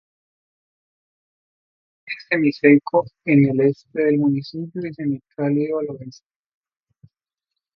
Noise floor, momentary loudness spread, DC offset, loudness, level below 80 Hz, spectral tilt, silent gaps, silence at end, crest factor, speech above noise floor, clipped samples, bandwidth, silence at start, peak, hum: -84 dBFS; 15 LU; under 0.1%; -20 LUFS; -66 dBFS; -9 dB/octave; none; 1.65 s; 22 dB; 65 dB; under 0.1%; 6.2 kHz; 2.05 s; 0 dBFS; none